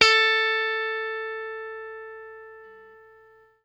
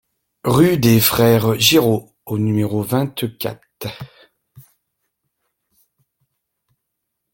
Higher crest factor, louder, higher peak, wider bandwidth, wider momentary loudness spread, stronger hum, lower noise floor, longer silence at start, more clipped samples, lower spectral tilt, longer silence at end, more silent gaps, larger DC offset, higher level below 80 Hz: first, 26 dB vs 18 dB; second, -23 LUFS vs -16 LUFS; about the same, -2 dBFS vs 0 dBFS; second, 11.5 kHz vs 17 kHz; first, 24 LU vs 18 LU; first, 60 Hz at -70 dBFS vs none; second, -55 dBFS vs -77 dBFS; second, 0 s vs 0.45 s; neither; second, 0.5 dB/octave vs -5 dB/octave; second, 0.75 s vs 2.75 s; neither; neither; second, -62 dBFS vs -50 dBFS